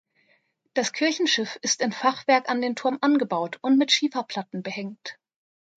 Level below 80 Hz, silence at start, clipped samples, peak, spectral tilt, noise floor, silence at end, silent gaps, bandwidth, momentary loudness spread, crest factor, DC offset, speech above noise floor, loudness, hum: -78 dBFS; 0.75 s; under 0.1%; -6 dBFS; -2.5 dB/octave; -67 dBFS; 0.65 s; none; 9.2 kHz; 12 LU; 20 dB; under 0.1%; 43 dB; -24 LUFS; none